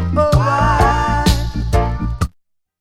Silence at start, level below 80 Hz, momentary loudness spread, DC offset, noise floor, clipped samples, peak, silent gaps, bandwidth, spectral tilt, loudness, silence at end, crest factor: 0 s; -22 dBFS; 8 LU; under 0.1%; -59 dBFS; under 0.1%; 0 dBFS; none; 15.5 kHz; -6 dB/octave; -16 LUFS; 0.55 s; 16 dB